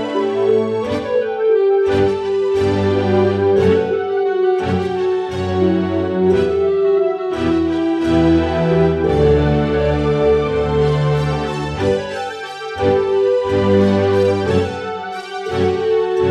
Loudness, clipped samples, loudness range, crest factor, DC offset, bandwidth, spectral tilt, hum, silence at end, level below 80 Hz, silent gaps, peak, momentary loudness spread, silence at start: -16 LUFS; under 0.1%; 2 LU; 14 dB; under 0.1%; 9.4 kHz; -7.5 dB/octave; none; 0 s; -34 dBFS; none; -2 dBFS; 6 LU; 0 s